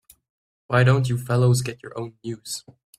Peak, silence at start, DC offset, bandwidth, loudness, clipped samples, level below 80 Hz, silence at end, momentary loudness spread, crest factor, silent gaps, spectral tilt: -4 dBFS; 0.7 s; under 0.1%; 14 kHz; -22 LUFS; under 0.1%; -56 dBFS; 0.4 s; 16 LU; 20 dB; none; -6 dB/octave